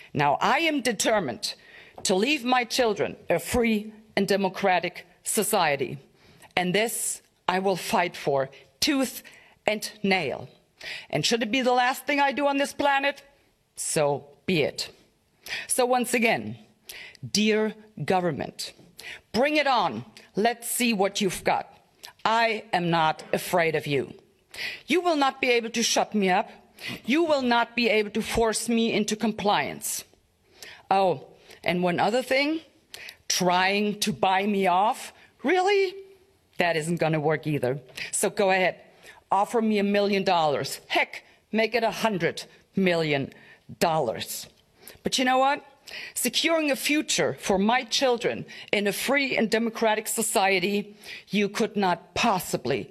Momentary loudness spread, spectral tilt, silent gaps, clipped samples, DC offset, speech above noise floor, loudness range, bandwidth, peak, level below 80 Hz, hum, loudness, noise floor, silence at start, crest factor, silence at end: 12 LU; -3.5 dB/octave; none; under 0.1%; under 0.1%; 36 dB; 3 LU; 15 kHz; -4 dBFS; -60 dBFS; none; -25 LUFS; -61 dBFS; 0.15 s; 22 dB; 0.05 s